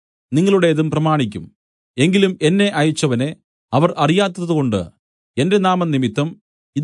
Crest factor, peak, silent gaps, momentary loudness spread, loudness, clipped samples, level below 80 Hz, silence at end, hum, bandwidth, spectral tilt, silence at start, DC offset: 16 dB; -2 dBFS; 1.56-1.94 s, 3.44-3.68 s, 4.99-5.34 s, 6.41-6.73 s; 10 LU; -17 LUFS; under 0.1%; -60 dBFS; 0 s; none; 11 kHz; -6 dB/octave; 0.3 s; under 0.1%